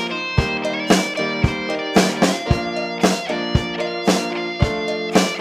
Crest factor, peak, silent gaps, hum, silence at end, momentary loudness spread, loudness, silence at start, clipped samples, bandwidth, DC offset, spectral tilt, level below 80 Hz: 18 dB; -2 dBFS; none; none; 0 s; 5 LU; -20 LUFS; 0 s; under 0.1%; 15 kHz; under 0.1%; -4.5 dB/octave; -34 dBFS